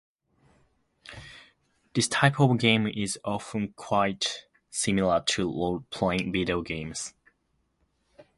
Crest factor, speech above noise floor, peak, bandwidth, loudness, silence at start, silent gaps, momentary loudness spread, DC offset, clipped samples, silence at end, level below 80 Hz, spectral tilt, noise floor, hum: 24 dB; 47 dB; -4 dBFS; 11.5 kHz; -27 LUFS; 1.05 s; none; 17 LU; under 0.1%; under 0.1%; 0.15 s; -54 dBFS; -4.5 dB/octave; -73 dBFS; none